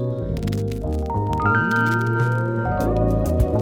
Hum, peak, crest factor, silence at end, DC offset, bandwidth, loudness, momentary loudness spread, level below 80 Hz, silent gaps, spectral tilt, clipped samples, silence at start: none; -6 dBFS; 14 dB; 0 s; under 0.1%; 16.5 kHz; -21 LUFS; 7 LU; -30 dBFS; none; -8 dB/octave; under 0.1%; 0 s